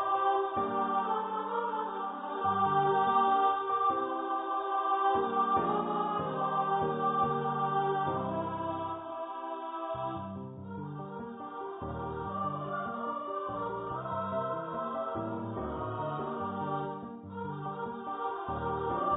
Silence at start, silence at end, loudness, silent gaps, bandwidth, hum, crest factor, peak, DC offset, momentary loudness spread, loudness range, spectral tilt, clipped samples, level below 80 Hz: 0 s; 0 s; -33 LUFS; none; 3.9 kHz; none; 16 dB; -16 dBFS; under 0.1%; 11 LU; 9 LU; -2.5 dB/octave; under 0.1%; -58 dBFS